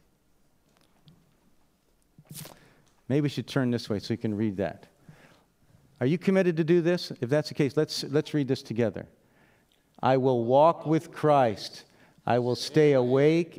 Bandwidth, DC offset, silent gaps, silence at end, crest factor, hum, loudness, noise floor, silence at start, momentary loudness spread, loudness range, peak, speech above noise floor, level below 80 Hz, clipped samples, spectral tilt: 16 kHz; under 0.1%; none; 0.1 s; 18 dB; none; -26 LUFS; -67 dBFS; 2.3 s; 15 LU; 8 LU; -8 dBFS; 42 dB; -70 dBFS; under 0.1%; -6.5 dB/octave